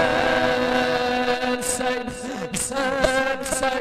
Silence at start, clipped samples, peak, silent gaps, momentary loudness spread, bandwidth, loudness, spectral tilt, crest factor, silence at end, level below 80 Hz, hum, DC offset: 0 s; under 0.1%; -6 dBFS; none; 7 LU; 13.5 kHz; -22 LUFS; -3 dB/octave; 16 dB; 0 s; -44 dBFS; none; under 0.1%